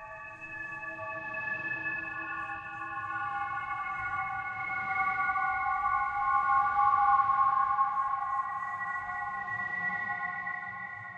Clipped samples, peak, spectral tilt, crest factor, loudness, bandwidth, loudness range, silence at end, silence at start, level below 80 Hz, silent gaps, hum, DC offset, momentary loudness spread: under 0.1%; -14 dBFS; -5 dB/octave; 18 dB; -31 LUFS; 7.4 kHz; 8 LU; 0 s; 0 s; -62 dBFS; none; none; under 0.1%; 12 LU